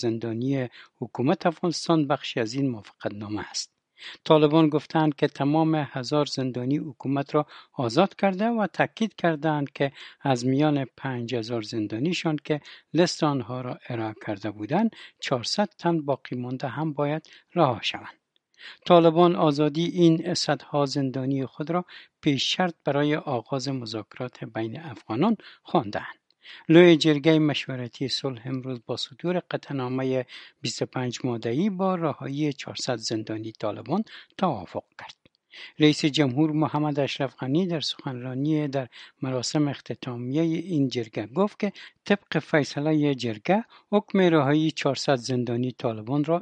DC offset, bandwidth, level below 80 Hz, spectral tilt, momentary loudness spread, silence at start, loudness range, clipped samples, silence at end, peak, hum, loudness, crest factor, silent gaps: under 0.1%; 9.6 kHz; -72 dBFS; -6 dB/octave; 13 LU; 0 s; 6 LU; under 0.1%; 0 s; -2 dBFS; none; -25 LUFS; 22 dB; none